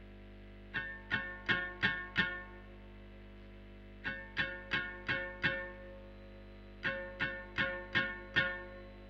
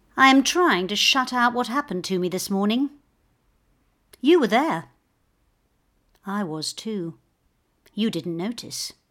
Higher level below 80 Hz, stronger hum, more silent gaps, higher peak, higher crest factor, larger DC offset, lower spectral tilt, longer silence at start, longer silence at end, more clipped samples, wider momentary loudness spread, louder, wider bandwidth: first, -54 dBFS vs -64 dBFS; first, 50 Hz at -55 dBFS vs none; neither; second, -16 dBFS vs -2 dBFS; about the same, 24 dB vs 22 dB; neither; first, -5.5 dB/octave vs -3.5 dB/octave; second, 0 s vs 0.15 s; second, 0 s vs 0.2 s; neither; first, 21 LU vs 13 LU; second, -37 LUFS vs -22 LUFS; second, 8.4 kHz vs 17.5 kHz